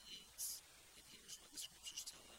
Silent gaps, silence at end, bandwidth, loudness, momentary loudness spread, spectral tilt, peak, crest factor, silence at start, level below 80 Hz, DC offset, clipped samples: none; 0 s; 16.5 kHz; -51 LUFS; 13 LU; 1 dB/octave; -34 dBFS; 22 dB; 0 s; -78 dBFS; under 0.1%; under 0.1%